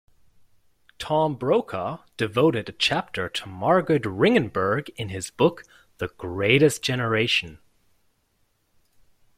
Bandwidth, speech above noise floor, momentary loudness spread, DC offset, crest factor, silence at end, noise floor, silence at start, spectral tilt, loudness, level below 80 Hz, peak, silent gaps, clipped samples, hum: 15.5 kHz; 45 dB; 12 LU; under 0.1%; 22 dB; 1.8 s; -68 dBFS; 1 s; -5 dB/octave; -23 LUFS; -58 dBFS; -4 dBFS; none; under 0.1%; none